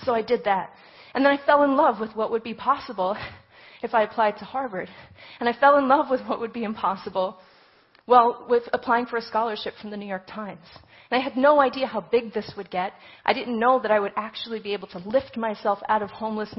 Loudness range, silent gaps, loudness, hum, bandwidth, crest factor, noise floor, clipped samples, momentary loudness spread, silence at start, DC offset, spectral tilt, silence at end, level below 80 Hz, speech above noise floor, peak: 3 LU; none; -24 LUFS; none; 5.8 kHz; 20 dB; -57 dBFS; under 0.1%; 15 LU; 0 s; under 0.1%; -8.5 dB/octave; 0.05 s; -62 dBFS; 33 dB; -4 dBFS